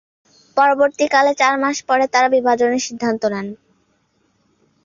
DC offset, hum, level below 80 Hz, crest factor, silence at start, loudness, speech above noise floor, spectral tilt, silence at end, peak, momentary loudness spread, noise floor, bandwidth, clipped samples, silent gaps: under 0.1%; none; -64 dBFS; 16 dB; 0.55 s; -16 LUFS; 47 dB; -3 dB/octave; 1.3 s; -2 dBFS; 8 LU; -63 dBFS; 7.6 kHz; under 0.1%; none